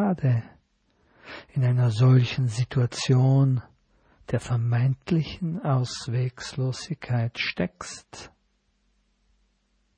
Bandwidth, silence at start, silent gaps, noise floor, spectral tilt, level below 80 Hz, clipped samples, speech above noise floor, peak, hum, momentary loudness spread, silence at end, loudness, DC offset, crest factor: 9.4 kHz; 0 s; none; -70 dBFS; -6.5 dB/octave; -56 dBFS; under 0.1%; 46 dB; -8 dBFS; none; 14 LU; 1.7 s; -25 LUFS; under 0.1%; 16 dB